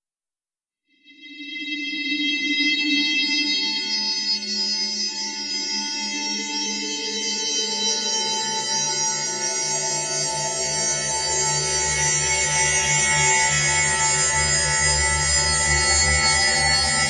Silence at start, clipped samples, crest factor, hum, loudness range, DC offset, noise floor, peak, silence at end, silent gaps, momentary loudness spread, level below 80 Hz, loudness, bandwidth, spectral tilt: 1.1 s; under 0.1%; 16 dB; none; 6 LU; under 0.1%; under -90 dBFS; -6 dBFS; 0 s; none; 7 LU; -40 dBFS; -19 LUFS; 11 kHz; -1 dB/octave